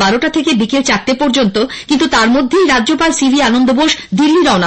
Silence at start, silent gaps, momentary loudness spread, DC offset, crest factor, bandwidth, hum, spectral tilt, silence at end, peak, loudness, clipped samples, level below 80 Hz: 0 s; none; 3 LU; under 0.1%; 10 dB; 8.8 kHz; none; -3.5 dB/octave; 0 s; -2 dBFS; -11 LUFS; under 0.1%; -40 dBFS